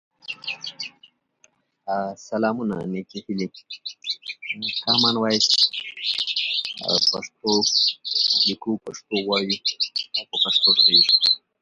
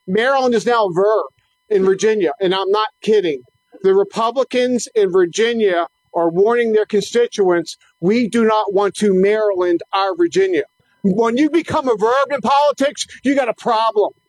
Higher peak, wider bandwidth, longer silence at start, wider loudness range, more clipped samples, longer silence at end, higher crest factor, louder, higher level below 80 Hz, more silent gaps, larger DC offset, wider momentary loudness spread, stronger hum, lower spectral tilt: about the same, -4 dBFS vs -6 dBFS; about the same, 11.5 kHz vs 12 kHz; first, 0.3 s vs 0.05 s; first, 11 LU vs 1 LU; neither; about the same, 0.25 s vs 0.2 s; first, 20 dB vs 10 dB; second, -20 LUFS vs -16 LUFS; second, -68 dBFS vs -60 dBFS; neither; neither; first, 16 LU vs 5 LU; neither; second, -2.5 dB/octave vs -5 dB/octave